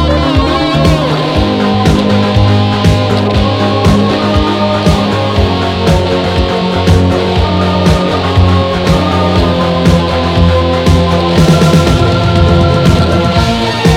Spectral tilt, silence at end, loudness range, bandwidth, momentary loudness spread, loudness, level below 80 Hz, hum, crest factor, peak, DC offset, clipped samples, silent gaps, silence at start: -6.5 dB/octave; 0 s; 2 LU; 14.5 kHz; 3 LU; -10 LUFS; -20 dBFS; none; 8 dB; 0 dBFS; under 0.1%; 0.5%; none; 0 s